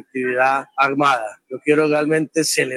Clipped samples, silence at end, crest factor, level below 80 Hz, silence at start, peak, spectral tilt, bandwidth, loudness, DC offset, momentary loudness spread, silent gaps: under 0.1%; 0 s; 16 dB; -82 dBFS; 0.15 s; -2 dBFS; -3.5 dB/octave; 14 kHz; -18 LUFS; under 0.1%; 6 LU; none